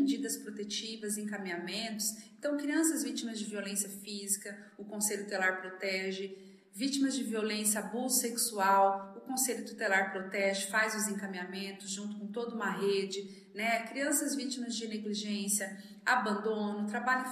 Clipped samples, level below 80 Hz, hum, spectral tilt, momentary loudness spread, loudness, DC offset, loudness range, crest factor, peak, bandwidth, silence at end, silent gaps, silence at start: under 0.1%; under -90 dBFS; none; -2.5 dB/octave; 9 LU; -33 LUFS; under 0.1%; 4 LU; 20 dB; -14 dBFS; 14.5 kHz; 0 s; none; 0 s